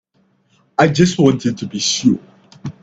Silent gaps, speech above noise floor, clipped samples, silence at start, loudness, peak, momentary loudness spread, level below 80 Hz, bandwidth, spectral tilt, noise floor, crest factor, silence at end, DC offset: none; 45 dB; under 0.1%; 0.8 s; -16 LUFS; 0 dBFS; 12 LU; -50 dBFS; 8.6 kHz; -5 dB/octave; -60 dBFS; 16 dB; 0.1 s; under 0.1%